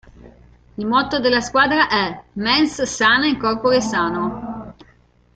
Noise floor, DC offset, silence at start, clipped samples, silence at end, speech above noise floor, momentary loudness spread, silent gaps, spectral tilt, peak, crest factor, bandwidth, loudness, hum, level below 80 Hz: -54 dBFS; under 0.1%; 0.25 s; under 0.1%; 0.65 s; 36 dB; 13 LU; none; -3.5 dB/octave; -2 dBFS; 18 dB; 9.2 kHz; -18 LUFS; 60 Hz at -45 dBFS; -46 dBFS